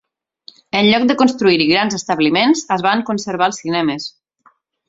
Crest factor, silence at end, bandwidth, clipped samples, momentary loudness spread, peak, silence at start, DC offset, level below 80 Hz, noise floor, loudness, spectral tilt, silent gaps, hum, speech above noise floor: 16 dB; 0.8 s; 8 kHz; under 0.1%; 8 LU; 0 dBFS; 0.75 s; under 0.1%; -56 dBFS; -55 dBFS; -15 LUFS; -4 dB/octave; none; none; 40 dB